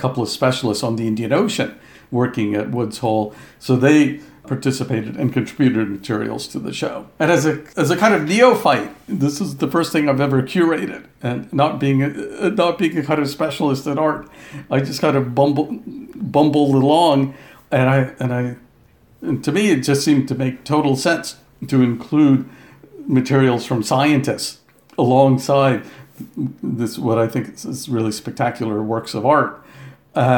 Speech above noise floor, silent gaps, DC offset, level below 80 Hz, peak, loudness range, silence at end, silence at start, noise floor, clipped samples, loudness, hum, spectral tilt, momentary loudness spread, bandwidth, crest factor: 34 dB; none; under 0.1%; -58 dBFS; 0 dBFS; 3 LU; 0 s; 0 s; -52 dBFS; under 0.1%; -18 LUFS; none; -6 dB/octave; 12 LU; 18 kHz; 18 dB